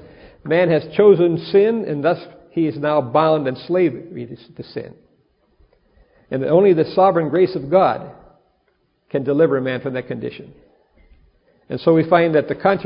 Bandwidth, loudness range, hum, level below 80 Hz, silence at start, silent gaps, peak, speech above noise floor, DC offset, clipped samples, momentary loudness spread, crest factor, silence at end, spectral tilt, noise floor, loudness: 5.4 kHz; 7 LU; none; -56 dBFS; 0.45 s; none; 0 dBFS; 47 dB; under 0.1%; under 0.1%; 18 LU; 18 dB; 0 s; -12 dB/octave; -64 dBFS; -17 LUFS